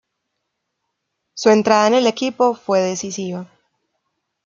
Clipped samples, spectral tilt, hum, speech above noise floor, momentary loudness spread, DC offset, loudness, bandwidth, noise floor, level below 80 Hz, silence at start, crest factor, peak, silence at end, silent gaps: under 0.1%; -4 dB/octave; none; 59 dB; 14 LU; under 0.1%; -17 LUFS; 7.6 kHz; -76 dBFS; -66 dBFS; 1.35 s; 18 dB; -2 dBFS; 1 s; none